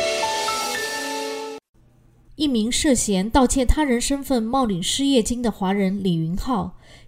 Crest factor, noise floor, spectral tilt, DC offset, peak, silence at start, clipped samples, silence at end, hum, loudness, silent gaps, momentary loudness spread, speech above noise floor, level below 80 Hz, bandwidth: 18 dB; -54 dBFS; -4 dB/octave; under 0.1%; -4 dBFS; 0 s; under 0.1%; 0.1 s; none; -21 LUFS; 1.69-1.74 s; 8 LU; 34 dB; -34 dBFS; 16 kHz